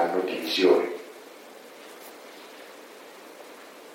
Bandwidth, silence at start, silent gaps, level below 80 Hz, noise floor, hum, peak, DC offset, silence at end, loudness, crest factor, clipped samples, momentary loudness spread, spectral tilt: 16.5 kHz; 0 s; none; under -90 dBFS; -46 dBFS; none; -8 dBFS; under 0.1%; 0 s; -24 LUFS; 22 dB; under 0.1%; 24 LU; -3.5 dB/octave